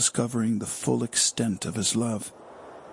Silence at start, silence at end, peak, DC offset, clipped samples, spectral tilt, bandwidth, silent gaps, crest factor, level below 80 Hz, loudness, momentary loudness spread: 0 s; 0 s; -10 dBFS; under 0.1%; under 0.1%; -3.5 dB/octave; 11.5 kHz; none; 18 dB; -66 dBFS; -26 LUFS; 19 LU